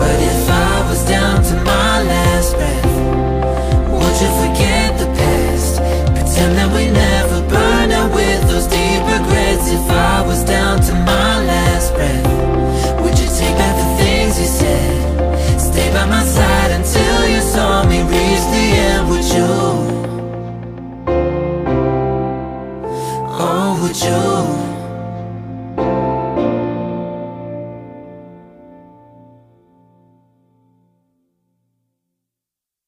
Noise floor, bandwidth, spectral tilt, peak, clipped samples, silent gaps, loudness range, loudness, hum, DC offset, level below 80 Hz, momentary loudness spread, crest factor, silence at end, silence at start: -85 dBFS; 16 kHz; -5 dB/octave; 0 dBFS; under 0.1%; none; 8 LU; -14 LUFS; none; under 0.1%; -20 dBFS; 11 LU; 14 dB; 4.5 s; 0 s